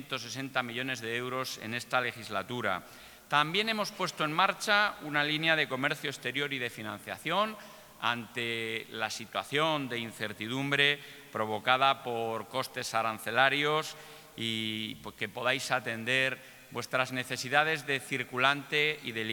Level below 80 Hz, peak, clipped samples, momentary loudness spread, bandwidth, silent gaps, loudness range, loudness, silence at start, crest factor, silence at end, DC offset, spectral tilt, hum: -72 dBFS; -8 dBFS; under 0.1%; 11 LU; 19.5 kHz; none; 4 LU; -31 LUFS; 0 s; 24 dB; 0 s; under 0.1%; -3.5 dB/octave; none